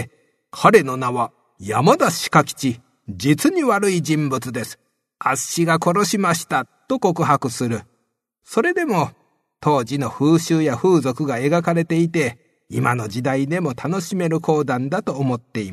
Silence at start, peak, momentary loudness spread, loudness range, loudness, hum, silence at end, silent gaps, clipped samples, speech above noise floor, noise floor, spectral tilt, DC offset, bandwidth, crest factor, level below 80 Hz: 0 s; 0 dBFS; 9 LU; 3 LU; -19 LUFS; none; 0 s; none; under 0.1%; 52 dB; -71 dBFS; -5.5 dB/octave; under 0.1%; 13.5 kHz; 20 dB; -60 dBFS